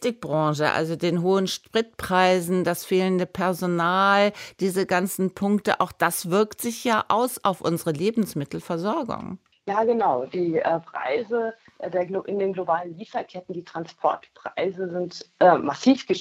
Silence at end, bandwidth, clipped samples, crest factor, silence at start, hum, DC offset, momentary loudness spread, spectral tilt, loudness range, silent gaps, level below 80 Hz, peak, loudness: 0 s; 16 kHz; under 0.1%; 20 dB; 0 s; none; under 0.1%; 12 LU; -5 dB/octave; 6 LU; none; -62 dBFS; -4 dBFS; -24 LUFS